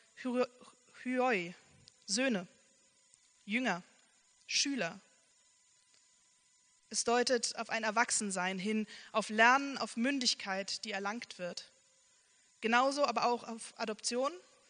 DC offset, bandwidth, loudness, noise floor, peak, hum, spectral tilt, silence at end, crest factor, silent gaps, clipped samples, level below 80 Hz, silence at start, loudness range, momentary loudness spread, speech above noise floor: under 0.1%; 10 kHz; -34 LUFS; -70 dBFS; -12 dBFS; none; -2.5 dB/octave; 0.3 s; 24 dB; none; under 0.1%; -84 dBFS; 0.15 s; 7 LU; 11 LU; 36 dB